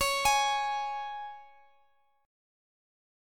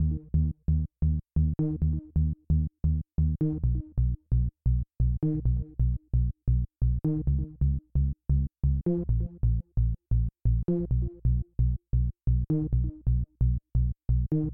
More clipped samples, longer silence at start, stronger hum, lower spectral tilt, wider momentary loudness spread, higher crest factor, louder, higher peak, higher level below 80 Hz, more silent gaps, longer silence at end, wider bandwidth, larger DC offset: neither; about the same, 0 s vs 0 s; neither; second, 0.5 dB/octave vs -14.5 dB/octave; first, 19 LU vs 2 LU; first, 18 dB vs 12 dB; about the same, -29 LUFS vs -29 LUFS; about the same, -14 dBFS vs -16 dBFS; second, -58 dBFS vs -30 dBFS; neither; first, 1.75 s vs 0 s; first, 17.5 kHz vs 1.3 kHz; second, under 0.1% vs 0.3%